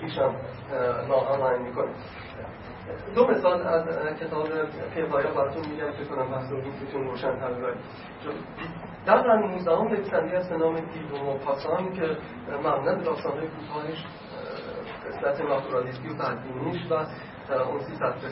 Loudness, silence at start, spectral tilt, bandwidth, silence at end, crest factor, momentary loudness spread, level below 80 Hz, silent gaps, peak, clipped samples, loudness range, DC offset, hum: -28 LUFS; 0 s; -10.5 dB/octave; 5.8 kHz; 0 s; 22 dB; 14 LU; -58 dBFS; none; -6 dBFS; under 0.1%; 5 LU; under 0.1%; none